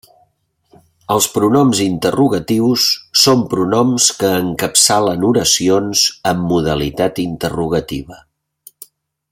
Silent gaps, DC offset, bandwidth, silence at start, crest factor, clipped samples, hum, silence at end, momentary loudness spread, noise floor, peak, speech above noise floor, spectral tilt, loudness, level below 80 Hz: none; under 0.1%; 16.5 kHz; 1.1 s; 16 dB; under 0.1%; none; 1.15 s; 8 LU; -61 dBFS; 0 dBFS; 47 dB; -3.5 dB/octave; -14 LUFS; -44 dBFS